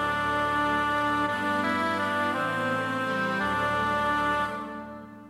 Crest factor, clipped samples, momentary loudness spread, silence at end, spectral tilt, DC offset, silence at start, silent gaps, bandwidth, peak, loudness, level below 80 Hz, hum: 12 dB; under 0.1%; 4 LU; 0 s; -5 dB/octave; under 0.1%; 0 s; none; 15.5 kHz; -14 dBFS; -26 LUFS; -52 dBFS; none